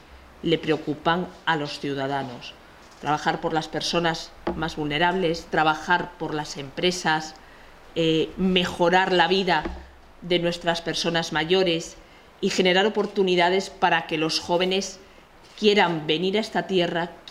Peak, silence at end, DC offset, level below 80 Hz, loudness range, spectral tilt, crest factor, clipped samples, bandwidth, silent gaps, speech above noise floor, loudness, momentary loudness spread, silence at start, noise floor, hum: -4 dBFS; 0 s; under 0.1%; -50 dBFS; 4 LU; -4.5 dB/octave; 20 dB; under 0.1%; 15 kHz; none; 26 dB; -23 LUFS; 11 LU; 0.1 s; -49 dBFS; none